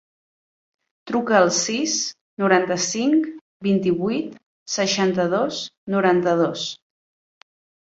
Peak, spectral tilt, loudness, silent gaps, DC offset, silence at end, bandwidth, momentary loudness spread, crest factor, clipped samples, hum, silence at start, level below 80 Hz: -2 dBFS; -4 dB/octave; -21 LUFS; 2.21-2.37 s, 3.41-3.60 s, 4.46-4.66 s, 5.77-5.87 s; under 0.1%; 1.2 s; 8 kHz; 10 LU; 20 dB; under 0.1%; none; 1.05 s; -64 dBFS